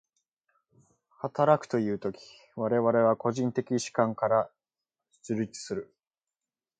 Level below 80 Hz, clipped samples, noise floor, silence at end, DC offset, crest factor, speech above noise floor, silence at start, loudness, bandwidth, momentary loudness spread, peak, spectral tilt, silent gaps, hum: -72 dBFS; under 0.1%; under -90 dBFS; 0.95 s; under 0.1%; 22 dB; over 62 dB; 1.25 s; -29 LUFS; 9.4 kHz; 13 LU; -8 dBFS; -6 dB/octave; none; none